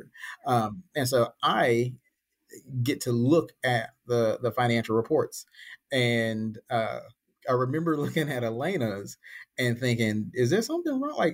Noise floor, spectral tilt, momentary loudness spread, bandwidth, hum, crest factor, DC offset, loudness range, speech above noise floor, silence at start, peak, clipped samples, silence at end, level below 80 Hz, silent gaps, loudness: -66 dBFS; -5.5 dB/octave; 13 LU; 16 kHz; none; 16 dB; under 0.1%; 2 LU; 39 dB; 0.15 s; -12 dBFS; under 0.1%; 0 s; -66 dBFS; none; -27 LUFS